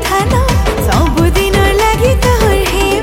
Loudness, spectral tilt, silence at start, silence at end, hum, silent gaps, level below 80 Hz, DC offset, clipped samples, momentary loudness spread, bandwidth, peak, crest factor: -11 LUFS; -5 dB/octave; 0 s; 0 s; none; none; -16 dBFS; under 0.1%; under 0.1%; 2 LU; 17 kHz; 0 dBFS; 10 dB